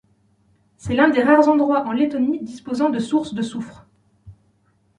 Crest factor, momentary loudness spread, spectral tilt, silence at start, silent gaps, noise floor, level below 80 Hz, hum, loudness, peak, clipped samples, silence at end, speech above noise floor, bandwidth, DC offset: 18 dB; 14 LU; -6 dB/octave; 0.85 s; none; -62 dBFS; -54 dBFS; none; -19 LUFS; -2 dBFS; under 0.1%; 0.65 s; 44 dB; 10.5 kHz; under 0.1%